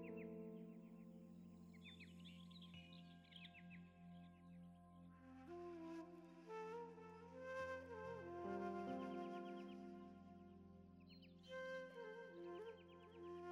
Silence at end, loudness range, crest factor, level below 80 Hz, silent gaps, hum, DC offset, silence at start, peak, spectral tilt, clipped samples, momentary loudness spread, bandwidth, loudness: 0 s; 9 LU; 18 dB; -86 dBFS; none; none; under 0.1%; 0 s; -38 dBFS; -6.5 dB/octave; under 0.1%; 13 LU; over 20 kHz; -56 LUFS